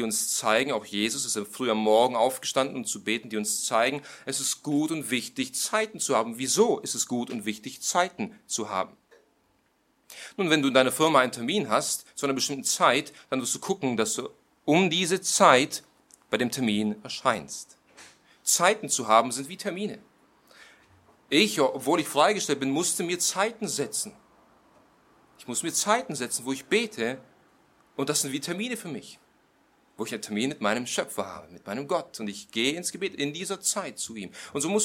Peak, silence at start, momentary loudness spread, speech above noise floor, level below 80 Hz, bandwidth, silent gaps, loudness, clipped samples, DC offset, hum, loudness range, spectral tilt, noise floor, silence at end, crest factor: -2 dBFS; 0 s; 13 LU; 42 dB; -72 dBFS; 16.5 kHz; none; -26 LUFS; under 0.1%; under 0.1%; none; 7 LU; -2.5 dB/octave; -68 dBFS; 0 s; 26 dB